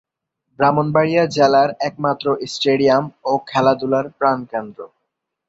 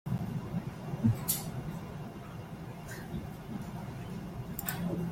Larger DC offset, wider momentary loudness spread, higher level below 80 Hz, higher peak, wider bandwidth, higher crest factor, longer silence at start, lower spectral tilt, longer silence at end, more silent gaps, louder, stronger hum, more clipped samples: neither; second, 9 LU vs 12 LU; second, -60 dBFS vs -54 dBFS; first, -2 dBFS vs -16 dBFS; second, 8 kHz vs 16.5 kHz; second, 16 dB vs 22 dB; first, 0.6 s vs 0.05 s; about the same, -6 dB/octave vs -5.5 dB/octave; first, 0.6 s vs 0 s; neither; first, -17 LUFS vs -37 LUFS; neither; neither